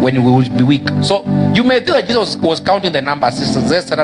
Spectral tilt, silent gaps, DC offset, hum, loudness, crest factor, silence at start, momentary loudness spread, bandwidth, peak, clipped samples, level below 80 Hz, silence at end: -6 dB/octave; none; under 0.1%; none; -13 LUFS; 12 dB; 0 s; 4 LU; 10.5 kHz; 0 dBFS; under 0.1%; -46 dBFS; 0 s